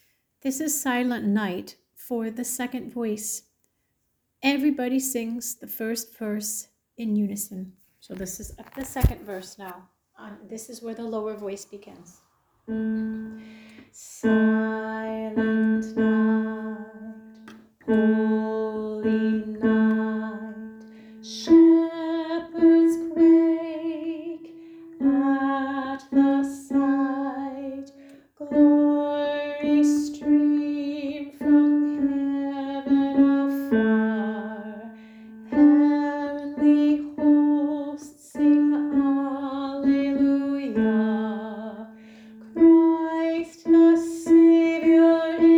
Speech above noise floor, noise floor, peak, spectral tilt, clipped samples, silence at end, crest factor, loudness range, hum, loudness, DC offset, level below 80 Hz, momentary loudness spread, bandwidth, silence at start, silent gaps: 48 dB; -74 dBFS; -4 dBFS; -5.5 dB/octave; under 0.1%; 0 s; 18 dB; 11 LU; none; -22 LUFS; under 0.1%; -46 dBFS; 19 LU; over 20 kHz; 0.45 s; none